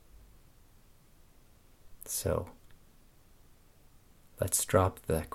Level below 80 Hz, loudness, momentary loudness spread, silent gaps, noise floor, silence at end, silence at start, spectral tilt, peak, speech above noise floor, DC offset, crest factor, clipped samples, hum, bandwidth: -54 dBFS; -31 LUFS; 15 LU; none; -60 dBFS; 0.05 s; 1.85 s; -4.5 dB/octave; -10 dBFS; 29 dB; under 0.1%; 26 dB; under 0.1%; none; 17 kHz